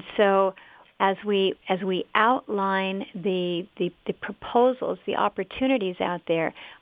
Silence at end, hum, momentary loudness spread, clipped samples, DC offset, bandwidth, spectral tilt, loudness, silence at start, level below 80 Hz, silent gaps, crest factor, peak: 0.05 s; none; 8 LU; under 0.1%; under 0.1%; 4.9 kHz; -8.5 dB/octave; -25 LUFS; 0 s; -64 dBFS; none; 22 dB; -4 dBFS